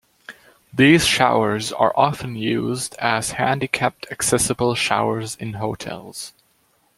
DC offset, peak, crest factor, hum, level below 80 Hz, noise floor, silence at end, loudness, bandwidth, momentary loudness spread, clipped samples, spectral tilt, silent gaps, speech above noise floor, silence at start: under 0.1%; -2 dBFS; 20 dB; none; -52 dBFS; -62 dBFS; 0.65 s; -19 LUFS; 16 kHz; 16 LU; under 0.1%; -4 dB/octave; none; 42 dB; 0.3 s